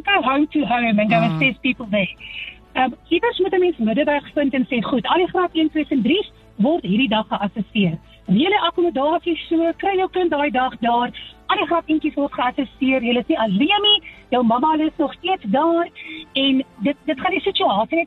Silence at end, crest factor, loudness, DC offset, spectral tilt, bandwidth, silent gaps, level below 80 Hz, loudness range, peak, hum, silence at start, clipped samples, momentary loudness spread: 0 s; 16 dB; -19 LUFS; under 0.1%; -7.5 dB/octave; 5.4 kHz; none; -50 dBFS; 2 LU; -4 dBFS; none; 0.05 s; under 0.1%; 6 LU